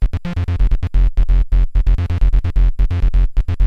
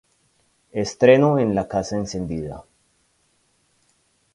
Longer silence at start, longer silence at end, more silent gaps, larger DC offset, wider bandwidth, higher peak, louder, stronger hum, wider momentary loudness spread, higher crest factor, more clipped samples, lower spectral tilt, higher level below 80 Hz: second, 0 s vs 0.75 s; second, 0 s vs 1.75 s; neither; neither; second, 4.5 kHz vs 11 kHz; about the same, -2 dBFS vs 0 dBFS; about the same, -19 LUFS vs -20 LUFS; neither; second, 3 LU vs 17 LU; second, 12 dB vs 22 dB; neither; first, -8.5 dB/octave vs -6.5 dB/octave; first, -14 dBFS vs -50 dBFS